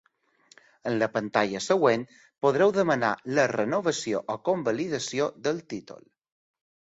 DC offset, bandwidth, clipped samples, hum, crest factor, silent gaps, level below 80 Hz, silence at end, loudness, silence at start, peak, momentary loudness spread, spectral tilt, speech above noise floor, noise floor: under 0.1%; 8 kHz; under 0.1%; none; 20 dB; none; -68 dBFS; 0.9 s; -26 LUFS; 0.85 s; -8 dBFS; 9 LU; -4.5 dB/octave; 36 dB; -62 dBFS